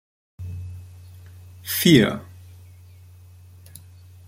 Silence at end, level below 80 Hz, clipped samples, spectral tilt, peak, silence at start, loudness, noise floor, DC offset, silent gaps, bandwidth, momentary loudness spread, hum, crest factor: 2.05 s; -56 dBFS; under 0.1%; -5 dB/octave; -2 dBFS; 0.4 s; -19 LUFS; -46 dBFS; under 0.1%; none; 16.5 kHz; 29 LU; none; 24 dB